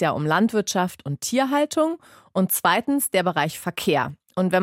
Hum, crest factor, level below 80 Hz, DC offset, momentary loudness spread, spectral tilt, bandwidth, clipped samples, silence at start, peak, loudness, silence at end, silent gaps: none; 18 dB; -64 dBFS; under 0.1%; 7 LU; -4.5 dB/octave; 16.5 kHz; under 0.1%; 0 s; -4 dBFS; -22 LUFS; 0 s; none